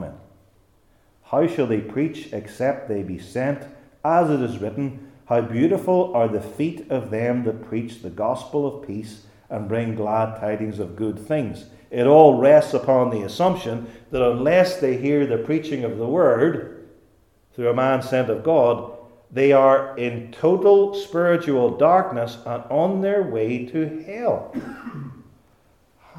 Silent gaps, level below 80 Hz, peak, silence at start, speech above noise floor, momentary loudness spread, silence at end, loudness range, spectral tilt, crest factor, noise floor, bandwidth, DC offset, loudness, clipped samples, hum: none; -58 dBFS; 0 dBFS; 0 s; 38 dB; 16 LU; 0 s; 8 LU; -7.5 dB/octave; 20 dB; -59 dBFS; 14 kHz; under 0.1%; -21 LUFS; under 0.1%; none